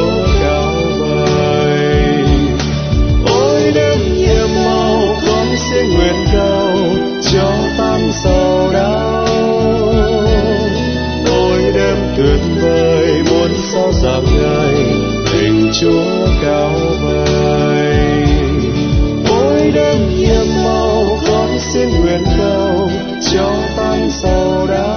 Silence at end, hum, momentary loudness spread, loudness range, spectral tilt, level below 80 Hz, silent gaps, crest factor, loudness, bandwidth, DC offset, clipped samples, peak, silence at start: 0 s; none; 3 LU; 1 LU; -6 dB/octave; -20 dBFS; none; 12 dB; -13 LUFS; 6.6 kHz; under 0.1%; under 0.1%; 0 dBFS; 0 s